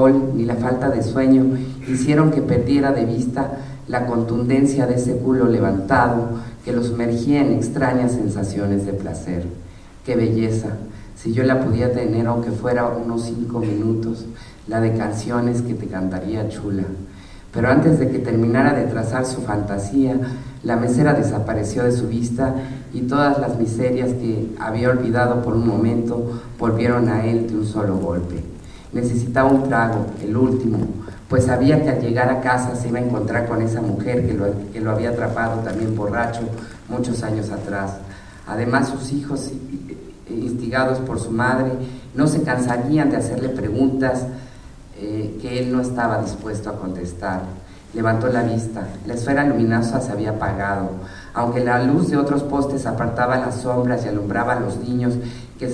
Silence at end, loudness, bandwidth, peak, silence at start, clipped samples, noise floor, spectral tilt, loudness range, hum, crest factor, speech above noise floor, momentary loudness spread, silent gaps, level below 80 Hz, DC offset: 0 s; -20 LUFS; 11 kHz; -2 dBFS; 0 s; under 0.1%; -39 dBFS; -7.5 dB/octave; 5 LU; none; 18 dB; 20 dB; 12 LU; none; -42 dBFS; under 0.1%